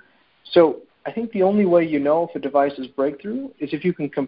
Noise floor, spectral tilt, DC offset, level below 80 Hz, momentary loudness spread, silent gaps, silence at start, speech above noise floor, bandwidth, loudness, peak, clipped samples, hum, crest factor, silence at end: -51 dBFS; -11.5 dB/octave; under 0.1%; -62 dBFS; 12 LU; none; 0.5 s; 31 dB; 5.2 kHz; -21 LUFS; -2 dBFS; under 0.1%; none; 18 dB; 0 s